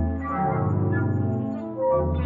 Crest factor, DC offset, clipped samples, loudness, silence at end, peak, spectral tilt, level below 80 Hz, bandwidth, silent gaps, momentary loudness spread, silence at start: 12 dB; under 0.1%; under 0.1%; -25 LUFS; 0 s; -12 dBFS; -11.5 dB/octave; -42 dBFS; 3.8 kHz; none; 4 LU; 0 s